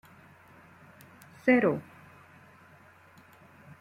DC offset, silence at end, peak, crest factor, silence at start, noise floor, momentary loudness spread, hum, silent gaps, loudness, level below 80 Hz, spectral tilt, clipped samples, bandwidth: under 0.1%; 2 s; -12 dBFS; 22 dB; 1.45 s; -57 dBFS; 29 LU; none; none; -27 LUFS; -74 dBFS; -7.5 dB/octave; under 0.1%; 15 kHz